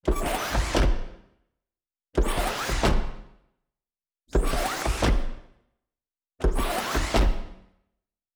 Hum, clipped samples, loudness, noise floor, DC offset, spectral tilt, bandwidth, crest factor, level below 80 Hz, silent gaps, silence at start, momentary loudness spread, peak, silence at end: none; under 0.1%; -27 LUFS; under -90 dBFS; under 0.1%; -4.5 dB/octave; over 20 kHz; 16 dB; -28 dBFS; none; 0.05 s; 11 LU; -10 dBFS; 0.8 s